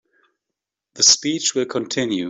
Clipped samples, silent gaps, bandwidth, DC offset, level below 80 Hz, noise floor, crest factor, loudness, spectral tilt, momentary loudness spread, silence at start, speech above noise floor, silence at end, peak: under 0.1%; none; 8.4 kHz; under 0.1%; -66 dBFS; -84 dBFS; 20 dB; -17 LUFS; -1.5 dB/octave; 10 LU; 0.95 s; 65 dB; 0 s; -2 dBFS